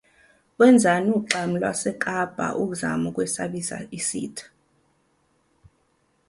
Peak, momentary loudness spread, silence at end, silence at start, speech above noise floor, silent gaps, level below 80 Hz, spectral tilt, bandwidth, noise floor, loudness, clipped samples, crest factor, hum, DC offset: -2 dBFS; 14 LU; 1.85 s; 0.6 s; 44 dB; none; -62 dBFS; -4.5 dB/octave; 11.5 kHz; -67 dBFS; -23 LUFS; under 0.1%; 22 dB; none; under 0.1%